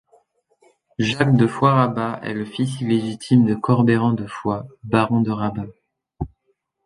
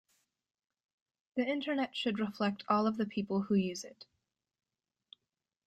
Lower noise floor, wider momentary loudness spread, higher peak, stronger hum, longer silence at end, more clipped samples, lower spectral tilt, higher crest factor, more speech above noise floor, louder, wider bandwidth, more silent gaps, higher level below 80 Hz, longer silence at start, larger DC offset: second, -70 dBFS vs -90 dBFS; first, 16 LU vs 8 LU; first, -2 dBFS vs -16 dBFS; neither; second, 0.6 s vs 1.65 s; neither; first, -7.5 dB/octave vs -5.5 dB/octave; about the same, 18 dB vs 20 dB; second, 51 dB vs 56 dB; first, -20 LUFS vs -34 LUFS; about the same, 11.5 kHz vs 12 kHz; neither; first, -50 dBFS vs -76 dBFS; second, 1 s vs 1.35 s; neither